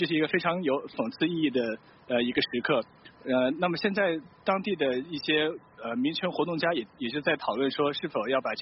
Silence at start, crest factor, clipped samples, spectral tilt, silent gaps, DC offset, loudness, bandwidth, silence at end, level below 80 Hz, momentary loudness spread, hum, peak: 0 s; 16 dB; under 0.1%; -3 dB/octave; none; under 0.1%; -28 LUFS; 5.8 kHz; 0 s; -68 dBFS; 6 LU; none; -12 dBFS